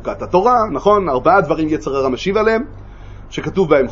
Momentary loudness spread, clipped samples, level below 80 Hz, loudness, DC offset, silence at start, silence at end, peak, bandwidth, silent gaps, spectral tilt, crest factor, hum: 8 LU; under 0.1%; -36 dBFS; -15 LUFS; under 0.1%; 0 s; 0 s; 0 dBFS; 7.6 kHz; none; -6.5 dB/octave; 16 dB; none